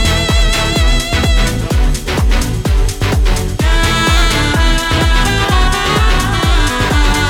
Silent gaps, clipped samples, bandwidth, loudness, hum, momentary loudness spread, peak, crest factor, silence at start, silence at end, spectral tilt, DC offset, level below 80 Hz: none; under 0.1%; 16.5 kHz; -13 LUFS; none; 4 LU; -2 dBFS; 10 dB; 0 s; 0 s; -4 dB/octave; under 0.1%; -14 dBFS